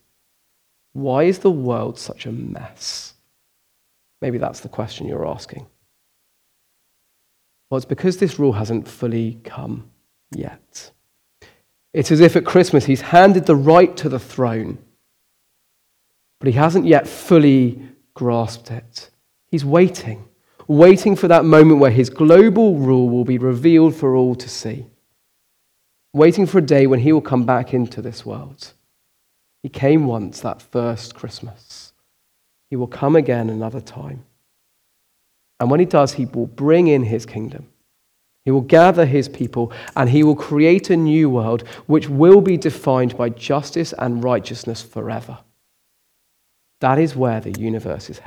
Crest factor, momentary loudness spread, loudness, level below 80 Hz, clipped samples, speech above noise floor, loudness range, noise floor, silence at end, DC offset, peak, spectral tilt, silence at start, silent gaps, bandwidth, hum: 16 dB; 21 LU; -16 LUFS; -56 dBFS; under 0.1%; 50 dB; 14 LU; -66 dBFS; 0.1 s; under 0.1%; 0 dBFS; -7.5 dB/octave; 0.95 s; none; 14 kHz; none